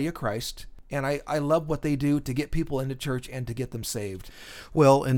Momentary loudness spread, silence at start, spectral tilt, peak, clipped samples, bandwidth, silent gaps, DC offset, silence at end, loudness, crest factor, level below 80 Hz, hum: 13 LU; 0 s; -6 dB/octave; -6 dBFS; under 0.1%; 18.5 kHz; none; under 0.1%; 0 s; -28 LUFS; 20 dB; -42 dBFS; none